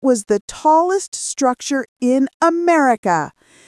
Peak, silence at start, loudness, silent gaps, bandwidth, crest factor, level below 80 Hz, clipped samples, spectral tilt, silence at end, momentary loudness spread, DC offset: -2 dBFS; 0 s; -17 LUFS; 0.41-0.48 s, 1.08-1.12 s, 1.88-1.96 s, 2.34-2.40 s, 2.98-3.03 s; 12 kHz; 16 dB; -58 dBFS; under 0.1%; -4 dB/octave; 0.4 s; 7 LU; under 0.1%